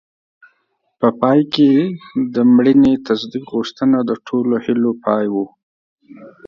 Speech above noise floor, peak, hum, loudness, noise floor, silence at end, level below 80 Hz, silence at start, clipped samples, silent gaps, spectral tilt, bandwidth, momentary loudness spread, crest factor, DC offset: 51 dB; 0 dBFS; none; -16 LUFS; -66 dBFS; 0.2 s; -54 dBFS; 1 s; under 0.1%; 5.63-5.96 s; -7.5 dB/octave; 6.8 kHz; 10 LU; 16 dB; under 0.1%